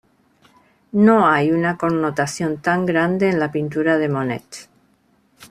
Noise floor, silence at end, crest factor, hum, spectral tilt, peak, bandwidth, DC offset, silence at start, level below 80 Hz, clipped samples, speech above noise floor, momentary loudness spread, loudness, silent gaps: -60 dBFS; 0.05 s; 16 dB; none; -6.5 dB/octave; -2 dBFS; 13.5 kHz; under 0.1%; 0.95 s; -58 dBFS; under 0.1%; 42 dB; 11 LU; -18 LUFS; none